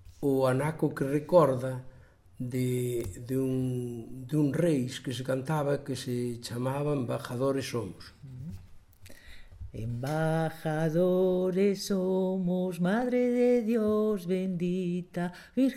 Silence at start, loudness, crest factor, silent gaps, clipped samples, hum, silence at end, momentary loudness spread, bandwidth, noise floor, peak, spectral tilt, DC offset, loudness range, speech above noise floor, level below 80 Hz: 0 s; -29 LUFS; 20 dB; none; under 0.1%; none; 0 s; 13 LU; 16 kHz; -50 dBFS; -10 dBFS; -7 dB/octave; under 0.1%; 7 LU; 21 dB; -56 dBFS